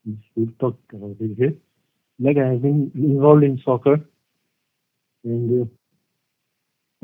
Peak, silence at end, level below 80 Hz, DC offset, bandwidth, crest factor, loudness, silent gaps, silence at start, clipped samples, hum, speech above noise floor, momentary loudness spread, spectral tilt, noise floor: 0 dBFS; 1.35 s; -70 dBFS; under 0.1%; 3.7 kHz; 20 dB; -20 LUFS; none; 0.05 s; under 0.1%; none; 57 dB; 17 LU; -12 dB/octave; -76 dBFS